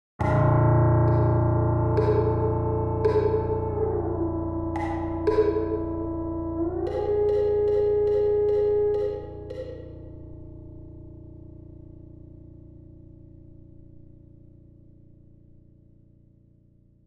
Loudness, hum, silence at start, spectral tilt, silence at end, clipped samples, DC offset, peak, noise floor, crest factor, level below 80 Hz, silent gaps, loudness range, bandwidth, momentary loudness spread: -24 LUFS; none; 0.2 s; -10.5 dB/octave; 1.95 s; under 0.1%; under 0.1%; -10 dBFS; -58 dBFS; 16 dB; -42 dBFS; none; 22 LU; 5.4 kHz; 23 LU